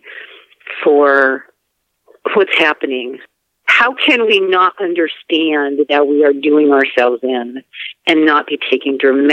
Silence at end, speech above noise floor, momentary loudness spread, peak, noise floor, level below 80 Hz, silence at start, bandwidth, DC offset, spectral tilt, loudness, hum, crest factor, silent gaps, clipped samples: 0 s; 56 dB; 16 LU; 0 dBFS; -69 dBFS; -74 dBFS; 0.05 s; 8.8 kHz; under 0.1%; -4 dB/octave; -13 LUFS; none; 14 dB; none; under 0.1%